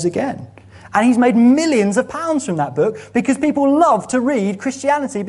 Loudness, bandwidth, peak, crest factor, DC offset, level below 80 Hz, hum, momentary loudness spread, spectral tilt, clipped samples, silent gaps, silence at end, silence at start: -16 LUFS; 11.5 kHz; 0 dBFS; 16 dB; under 0.1%; -56 dBFS; none; 8 LU; -5.5 dB/octave; under 0.1%; none; 0 s; 0 s